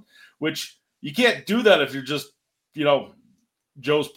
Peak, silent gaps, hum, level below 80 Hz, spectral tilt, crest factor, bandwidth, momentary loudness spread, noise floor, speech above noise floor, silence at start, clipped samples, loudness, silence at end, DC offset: -2 dBFS; none; none; -72 dBFS; -4.5 dB/octave; 22 dB; 17 kHz; 20 LU; -66 dBFS; 44 dB; 0.4 s; under 0.1%; -22 LUFS; 0.1 s; under 0.1%